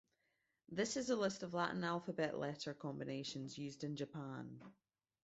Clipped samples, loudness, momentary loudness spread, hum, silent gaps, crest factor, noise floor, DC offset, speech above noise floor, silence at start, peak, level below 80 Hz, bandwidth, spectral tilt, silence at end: under 0.1%; -43 LUFS; 10 LU; none; none; 20 dB; -85 dBFS; under 0.1%; 42 dB; 0.7 s; -24 dBFS; -80 dBFS; 8 kHz; -4.5 dB/octave; 0.5 s